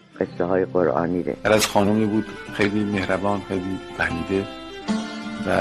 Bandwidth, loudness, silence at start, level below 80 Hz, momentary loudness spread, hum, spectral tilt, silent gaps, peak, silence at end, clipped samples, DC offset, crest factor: 14.5 kHz; -23 LUFS; 0.15 s; -50 dBFS; 10 LU; none; -5 dB/octave; none; -4 dBFS; 0 s; under 0.1%; 0.2%; 18 dB